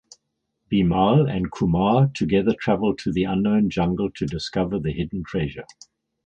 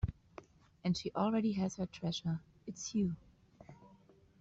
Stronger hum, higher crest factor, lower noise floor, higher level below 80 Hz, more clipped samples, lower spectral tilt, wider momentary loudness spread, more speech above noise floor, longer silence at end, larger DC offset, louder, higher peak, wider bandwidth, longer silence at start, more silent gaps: neither; about the same, 18 dB vs 16 dB; first, -76 dBFS vs -64 dBFS; first, -44 dBFS vs -56 dBFS; neither; first, -7.5 dB/octave vs -6 dB/octave; second, 9 LU vs 23 LU; first, 55 dB vs 28 dB; about the same, 0.6 s vs 0.55 s; neither; first, -22 LUFS vs -37 LUFS; first, -4 dBFS vs -22 dBFS; about the same, 8.8 kHz vs 8 kHz; first, 0.7 s vs 0 s; neither